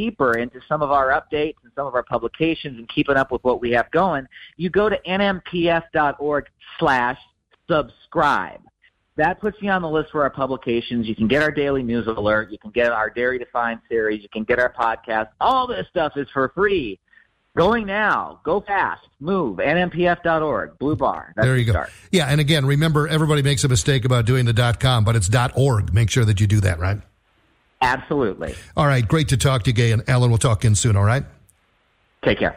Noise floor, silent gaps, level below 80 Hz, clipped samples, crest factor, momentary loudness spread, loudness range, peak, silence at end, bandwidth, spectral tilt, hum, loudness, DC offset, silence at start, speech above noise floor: -63 dBFS; none; -42 dBFS; under 0.1%; 14 dB; 7 LU; 4 LU; -6 dBFS; 0 s; 15.5 kHz; -5.5 dB/octave; none; -20 LUFS; under 0.1%; 0 s; 43 dB